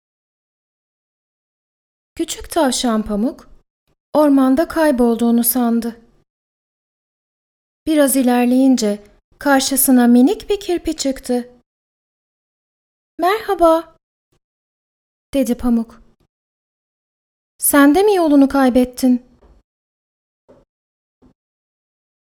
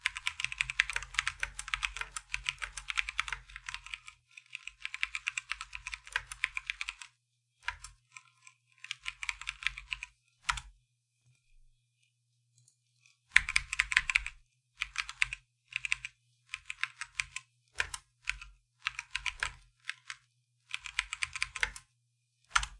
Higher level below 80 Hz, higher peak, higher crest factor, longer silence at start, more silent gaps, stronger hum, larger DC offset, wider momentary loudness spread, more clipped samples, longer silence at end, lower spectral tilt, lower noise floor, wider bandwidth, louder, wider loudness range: first, -44 dBFS vs -56 dBFS; about the same, 0 dBFS vs 0 dBFS; second, 18 dB vs 38 dB; first, 2.15 s vs 0.05 s; first, 3.70-3.87 s, 4.00-4.13 s, 6.30-7.86 s, 9.24-9.32 s, 11.66-13.18 s, 14.03-14.31 s, 14.44-15.33 s, 16.29-17.59 s vs none; neither; neither; second, 11 LU vs 17 LU; neither; first, 3.1 s vs 0 s; first, -3.5 dB/octave vs 1.5 dB/octave; first, under -90 dBFS vs -77 dBFS; first, 18.5 kHz vs 11.5 kHz; first, -15 LUFS vs -35 LUFS; about the same, 8 LU vs 9 LU